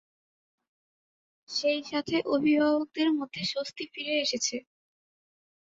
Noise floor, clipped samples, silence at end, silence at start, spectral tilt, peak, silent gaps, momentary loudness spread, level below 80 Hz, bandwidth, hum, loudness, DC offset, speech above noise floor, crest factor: under -90 dBFS; under 0.1%; 1.05 s; 1.5 s; -3 dB/octave; -14 dBFS; none; 10 LU; -72 dBFS; 7.8 kHz; none; -28 LUFS; under 0.1%; over 62 dB; 16 dB